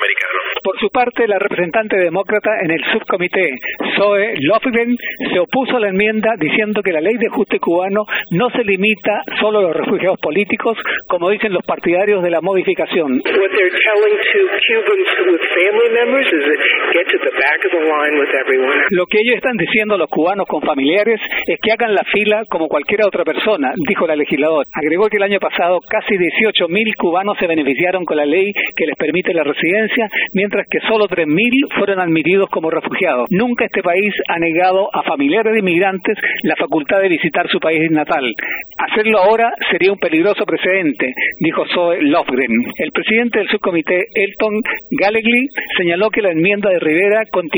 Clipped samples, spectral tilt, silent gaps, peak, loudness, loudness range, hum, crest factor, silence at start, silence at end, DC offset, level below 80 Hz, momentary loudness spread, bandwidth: under 0.1%; -6.5 dB/octave; none; -2 dBFS; -14 LUFS; 2 LU; none; 14 dB; 0 s; 0 s; under 0.1%; -56 dBFS; 4 LU; over 20 kHz